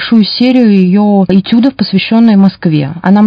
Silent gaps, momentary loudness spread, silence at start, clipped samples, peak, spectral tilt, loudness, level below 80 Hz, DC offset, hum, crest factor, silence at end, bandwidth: none; 6 LU; 0 s; 2%; 0 dBFS; -9 dB/octave; -8 LUFS; -48 dBFS; under 0.1%; none; 8 dB; 0 s; 5.2 kHz